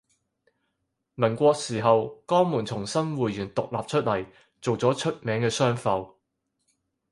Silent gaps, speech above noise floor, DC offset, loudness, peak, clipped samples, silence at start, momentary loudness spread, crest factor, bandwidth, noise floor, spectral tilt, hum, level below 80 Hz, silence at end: none; 54 dB; under 0.1%; -26 LUFS; -6 dBFS; under 0.1%; 1.2 s; 8 LU; 22 dB; 11.5 kHz; -78 dBFS; -5.5 dB/octave; none; -62 dBFS; 1.05 s